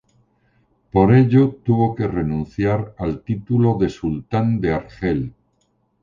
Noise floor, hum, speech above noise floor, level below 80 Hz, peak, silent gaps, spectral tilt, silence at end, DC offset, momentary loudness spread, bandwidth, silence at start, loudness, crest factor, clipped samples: -65 dBFS; none; 47 dB; -40 dBFS; -4 dBFS; none; -10 dB/octave; 0.7 s; under 0.1%; 12 LU; 7.2 kHz; 0.95 s; -19 LUFS; 16 dB; under 0.1%